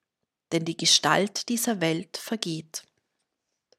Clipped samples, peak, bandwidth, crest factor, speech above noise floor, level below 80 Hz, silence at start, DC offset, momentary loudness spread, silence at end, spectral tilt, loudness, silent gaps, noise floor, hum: under 0.1%; -6 dBFS; 16 kHz; 24 dB; 58 dB; -76 dBFS; 0.5 s; under 0.1%; 15 LU; 1 s; -2.5 dB/octave; -25 LUFS; none; -84 dBFS; none